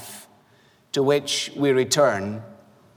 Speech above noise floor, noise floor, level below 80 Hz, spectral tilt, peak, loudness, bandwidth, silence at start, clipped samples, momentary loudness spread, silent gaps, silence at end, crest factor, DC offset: 36 dB; -58 dBFS; -72 dBFS; -3.5 dB/octave; -6 dBFS; -22 LUFS; over 20 kHz; 0 s; under 0.1%; 18 LU; none; 0.45 s; 18 dB; under 0.1%